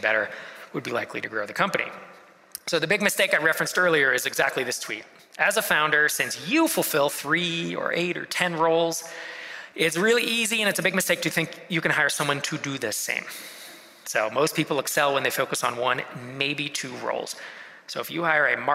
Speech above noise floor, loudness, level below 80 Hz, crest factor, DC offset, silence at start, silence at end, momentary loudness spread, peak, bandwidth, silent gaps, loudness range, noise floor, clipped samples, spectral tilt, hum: 20 dB; -24 LUFS; -72 dBFS; 20 dB; under 0.1%; 0 s; 0 s; 15 LU; -4 dBFS; 16 kHz; none; 4 LU; -45 dBFS; under 0.1%; -3 dB/octave; none